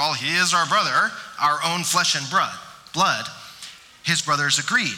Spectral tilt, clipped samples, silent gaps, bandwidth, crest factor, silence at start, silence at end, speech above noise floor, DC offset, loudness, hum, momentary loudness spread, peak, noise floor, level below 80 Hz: -1.5 dB/octave; under 0.1%; none; 18 kHz; 14 dB; 0 s; 0 s; 21 dB; under 0.1%; -20 LUFS; none; 17 LU; -8 dBFS; -42 dBFS; -66 dBFS